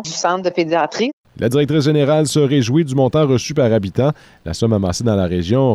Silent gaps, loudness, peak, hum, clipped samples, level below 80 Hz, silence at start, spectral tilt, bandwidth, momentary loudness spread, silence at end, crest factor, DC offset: 1.13-1.24 s; -16 LUFS; -4 dBFS; none; under 0.1%; -44 dBFS; 0 s; -6 dB/octave; 13.5 kHz; 6 LU; 0 s; 12 dB; under 0.1%